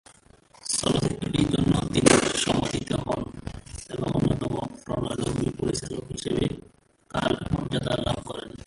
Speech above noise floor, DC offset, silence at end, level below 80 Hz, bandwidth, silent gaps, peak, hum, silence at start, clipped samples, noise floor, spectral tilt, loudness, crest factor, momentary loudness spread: 32 dB; under 0.1%; 0.1 s; -44 dBFS; 11.5 kHz; none; -2 dBFS; none; 0.65 s; under 0.1%; -56 dBFS; -4.5 dB/octave; -26 LUFS; 26 dB; 14 LU